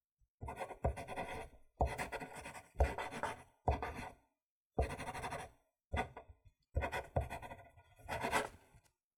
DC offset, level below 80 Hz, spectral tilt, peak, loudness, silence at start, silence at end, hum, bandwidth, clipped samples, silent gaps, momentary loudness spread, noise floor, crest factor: under 0.1%; -48 dBFS; -5.5 dB/octave; -20 dBFS; -43 LUFS; 0.4 s; 0.4 s; none; 18 kHz; under 0.1%; 4.46-4.70 s; 14 LU; -70 dBFS; 24 dB